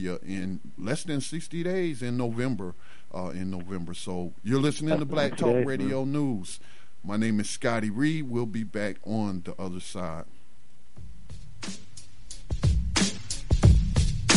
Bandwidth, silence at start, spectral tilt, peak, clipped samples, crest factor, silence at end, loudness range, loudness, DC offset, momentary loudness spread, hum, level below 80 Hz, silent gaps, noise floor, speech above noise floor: 11.5 kHz; 0 s; -5.5 dB/octave; -6 dBFS; under 0.1%; 22 dB; 0 s; 8 LU; -29 LUFS; 2%; 16 LU; none; -36 dBFS; none; -61 dBFS; 31 dB